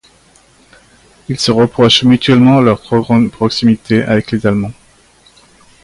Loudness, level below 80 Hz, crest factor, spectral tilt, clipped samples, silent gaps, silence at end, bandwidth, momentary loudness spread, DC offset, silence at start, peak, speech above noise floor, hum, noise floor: -11 LUFS; -44 dBFS; 12 dB; -6 dB/octave; under 0.1%; none; 1.1 s; 11.5 kHz; 8 LU; under 0.1%; 1.3 s; 0 dBFS; 37 dB; none; -47 dBFS